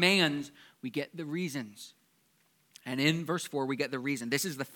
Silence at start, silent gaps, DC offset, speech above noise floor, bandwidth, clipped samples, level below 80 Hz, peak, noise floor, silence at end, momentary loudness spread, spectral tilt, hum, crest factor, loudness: 0 s; none; under 0.1%; 38 dB; 19 kHz; under 0.1%; -82 dBFS; -8 dBFS; -70 dBFS; 0 s; 17 LU; -4 dB/octave; none; 24 dB; -32 LUFS